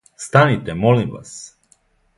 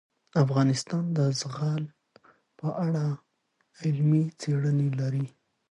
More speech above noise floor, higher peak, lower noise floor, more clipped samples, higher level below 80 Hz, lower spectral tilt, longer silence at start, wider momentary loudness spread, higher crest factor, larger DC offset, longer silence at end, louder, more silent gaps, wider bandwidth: second, 42 dB vs 48 dB; first, 0 dBFS vs -10 dBFS; second, -59 dBFS vs -74 dBFS; neither; first, -48 dBFS vs -72 dBFS; about the same, -6 dB/octave vs -7 dB/octave; second, 0.2 s vs 0.35 s; first, 20 LU vs 10 LU; about the same, 18 dB vs 18 dB; neither; first, 0.7 s vs 0.4 s; first, -17 LUFS vs -28 LUFS; neither; about the same, 11.5 kHz vs 10.5 kHz